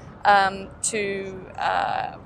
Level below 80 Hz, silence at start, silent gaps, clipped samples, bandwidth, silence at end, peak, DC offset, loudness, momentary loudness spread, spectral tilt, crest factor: -52 dBFS; 0 s; none; under 0.1%; 14 kHz; 0 s; -4 dBFS; under 0.1%; -23 LUFS; 11 LU; -2.5 dB/octave; 20 dB